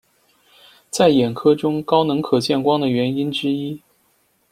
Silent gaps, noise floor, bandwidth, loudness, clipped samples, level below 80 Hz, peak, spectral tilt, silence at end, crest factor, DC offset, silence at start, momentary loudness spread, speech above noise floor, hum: none; -62 dBFS; 15.5 kHz; -18 LUFS; under 0.1%; -58 dBFS; -2 dBFS; -5.5 dB/octave; 0.75 s; 18 dB; under 0.1%; 0.95 s; 9 LU; 45 dB; none